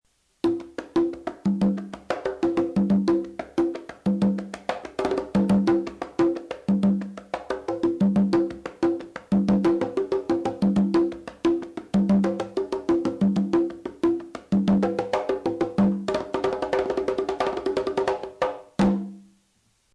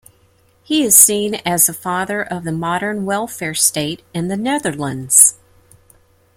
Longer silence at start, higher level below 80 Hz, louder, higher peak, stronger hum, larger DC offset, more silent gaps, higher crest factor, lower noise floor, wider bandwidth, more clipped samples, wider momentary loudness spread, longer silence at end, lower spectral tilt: second, 0.45 s vs 0.7 s; about the same, -52 dBFS vs -54 dBFS; second, -25 LUFS vs -14 LUFS; second, -14 dBFS vs 0 dBFS; neither; neither; neither; second, 12 dB vs 18 dB; first, -66 dBFS vs -55 dBFS; second, 10.5 kHz vs 17 kHz; second, under 0.1% vs 0.1%; second, 9 LU vs 14 LU; second, 0.75 s vs 1 s; first, -8 dB/octave vs -2.5 dB/octave